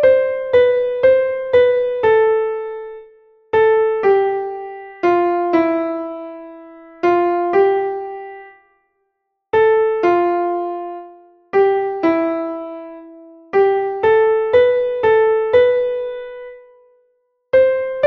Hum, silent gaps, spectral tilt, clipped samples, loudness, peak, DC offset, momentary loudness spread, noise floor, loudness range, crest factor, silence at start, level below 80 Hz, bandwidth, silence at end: none; none; -7 dB/octave; under 0.1%; -16 LUFS; -2 dBFS; under 0.1%; 17 LU; -72 dBFS; 4 LU; 14 dB; 0 s; -54 dBFS; 5.8 kHz; 0 s